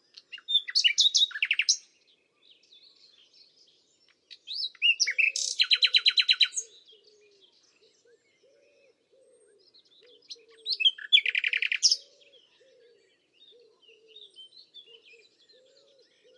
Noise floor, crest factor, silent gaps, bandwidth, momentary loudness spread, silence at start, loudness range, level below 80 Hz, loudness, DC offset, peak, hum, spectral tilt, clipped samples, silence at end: -67 dBFS; 24 dB; none; 11.5 kHz; 18 LU; 0.35 s; 9 LU; under -90 dBFS; -23 LUFS; under 0.1%; -6 dBFS; none; 6.5 dB/octave; under 0.1%; 1.6 s